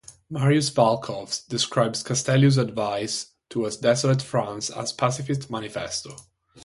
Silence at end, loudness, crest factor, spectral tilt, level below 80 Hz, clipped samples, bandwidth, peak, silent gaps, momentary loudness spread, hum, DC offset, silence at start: 0.05 s; -24 LUFS; 20 dB; -5 dB/octave; -60 dBFS; under 0.1%; 11.5 kHz; -4 dBFS; none; 11 LU; none; under 0.1%; 0.1 s